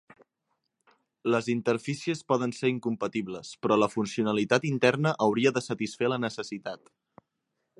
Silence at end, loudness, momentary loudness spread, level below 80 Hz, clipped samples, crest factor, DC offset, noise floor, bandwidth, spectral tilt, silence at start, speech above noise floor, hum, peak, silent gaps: 1.05 s; -28 LUFS; 11 LU; -72 dBFS; under 0.1%; 22 dB; under 0.1%; -81 dBFS; 11.5 kHz; -5.5 dB/octave; 1.25 s; 54 dB; none; -6 dBFS; none